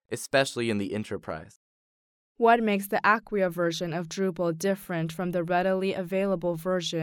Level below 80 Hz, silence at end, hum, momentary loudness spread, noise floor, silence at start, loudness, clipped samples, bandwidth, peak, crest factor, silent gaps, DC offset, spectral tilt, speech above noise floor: -62 dBFS; 0 s; none; 8 LU; under -90 dBFS; 0.1 s; -27 LUFS; under 0.1%; 18.5 kHz; -8 dBFS; 18 dB; 1.56-2.35 s; under 0.1%; -5 dB/octave; over 63 dB